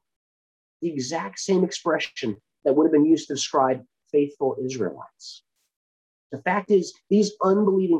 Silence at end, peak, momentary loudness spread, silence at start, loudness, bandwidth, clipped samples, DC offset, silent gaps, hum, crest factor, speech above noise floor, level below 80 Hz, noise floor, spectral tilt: 0 s; -8 dBFS; 12 LU; 0.8 s; -23 LUFS; 9.8 kHz; under 0.1%; under 0.1%; 5.76-6.30 s; none; 16 dB; over 68 dB; -72 dBFS; under -90 dBFS; -5 dB/octave